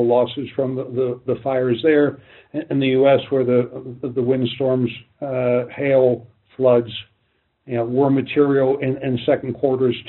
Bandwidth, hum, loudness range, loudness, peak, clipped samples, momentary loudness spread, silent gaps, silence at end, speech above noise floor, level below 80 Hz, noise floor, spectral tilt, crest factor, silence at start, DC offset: 4.2 kHz; none; 1 LU; -19 LUFS; -4 dBFS; under 0.1%; 10 LU; none; 0 s; 48 dB; -60 dBFS; -67 dBFS; -6 dB/octave; 16 dB; 0 s; under 0.1%